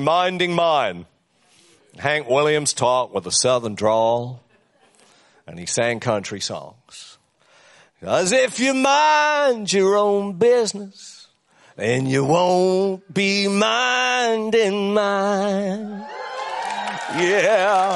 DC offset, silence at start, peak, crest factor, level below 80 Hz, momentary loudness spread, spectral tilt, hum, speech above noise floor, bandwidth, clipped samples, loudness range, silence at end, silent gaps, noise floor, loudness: under 0.1%; 0 s; -4 dBFS; 16 dB; -66 dBFS; 15 LU; -3.5 dB/octave; none; 39 dB; 11.5 kHz; under 0.1%; 6 LU; 0 s; none; -58 dBFS; -19 LUFS